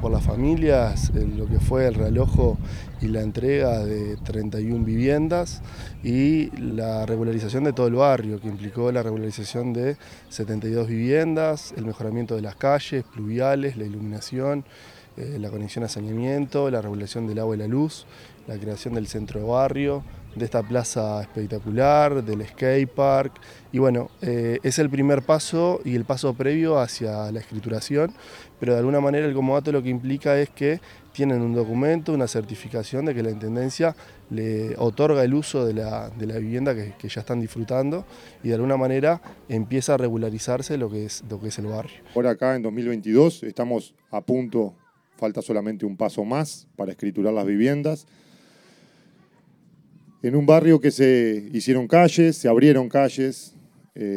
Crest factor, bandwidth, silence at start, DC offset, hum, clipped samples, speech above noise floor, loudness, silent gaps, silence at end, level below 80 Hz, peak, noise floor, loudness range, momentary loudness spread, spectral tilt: 22 dB; 16 kHz; 0 s; under 0.1%; none; under 0.1%; 34 dB; -23 LUFS; none; 0 s; -38 dBFS; -2 dBFS; -57 dBFS; 6 LU; 12 LU; -6.5 dB/octave